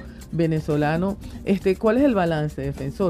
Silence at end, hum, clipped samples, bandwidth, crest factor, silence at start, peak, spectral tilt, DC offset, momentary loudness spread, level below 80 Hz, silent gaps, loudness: 0 s; none; under 0.1%; 15 kHz; 16 dB; 0 s; -6 dBFS; -8 dB/octave; under 0.1%; 10 LU; -42 dBFS; none; -23 LUFS